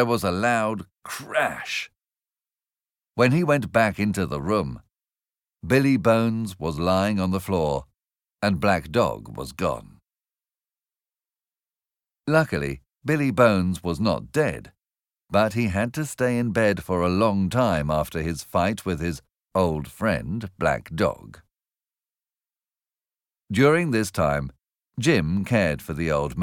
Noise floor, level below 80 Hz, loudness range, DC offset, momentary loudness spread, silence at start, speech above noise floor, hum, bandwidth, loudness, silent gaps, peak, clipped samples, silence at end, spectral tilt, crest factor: under -90 dBFS; -46 dBFS; 6 LU; under 0.1%; 12 LU; 0 s; over 67 dB; none; 18 kHz; -23 LUFS; none; -4 dBFS; under 0.1%; 0 s; -6 dB/octave; 20 dB